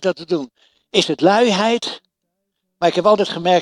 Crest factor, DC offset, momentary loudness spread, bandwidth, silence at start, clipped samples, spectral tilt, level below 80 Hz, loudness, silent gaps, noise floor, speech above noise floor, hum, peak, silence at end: 18 dB; under 0.1%; 11 LU; 12 kHz; 0 s; under 0.1%; -4.5 dB/octave; -66 dBFS; -17 LUFS; none; -76 dBFS; 59 dB; none; 0 dBFS; 0 s